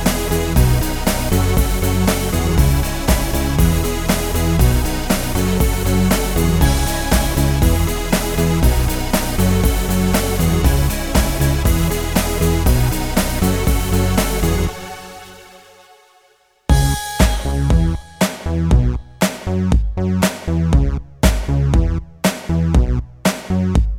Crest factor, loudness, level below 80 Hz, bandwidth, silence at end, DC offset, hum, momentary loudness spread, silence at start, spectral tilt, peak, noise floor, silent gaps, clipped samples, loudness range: 16 dB; -17 LUFS; -20 dBFS; over 20 kHz; 0 s; under 0.1%; none; 4 LU; 0 s; -5.5 dB/octave; 0 dBFS; -55 dBFS; none; under 0.1%; 3 LU